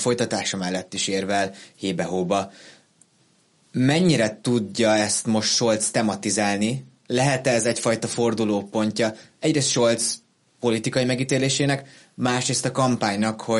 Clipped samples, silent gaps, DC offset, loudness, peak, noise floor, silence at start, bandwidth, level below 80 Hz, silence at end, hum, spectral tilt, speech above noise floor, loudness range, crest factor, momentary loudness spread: under 0.1%; none; under 0.1%; -22 LUFS; -8 dBFS; -61 dBFS; 0 s; 11.5 kHz; -62 dBFS; 0 s; none; -4 dB/octave; 39 dB; 4 LU; 16 dB; 8 LU